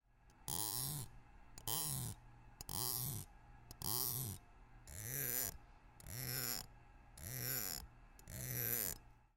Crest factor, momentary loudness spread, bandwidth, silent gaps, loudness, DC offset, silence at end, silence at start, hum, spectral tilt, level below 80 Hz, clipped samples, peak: 24 dB; 19 LU; 17 kHz; none; -42 LUFS; under 0.1%; 0.2 s; 0.25 s; none; -2.5 dB/octave; -62 dBFS; under 0.1%; -22 dBFS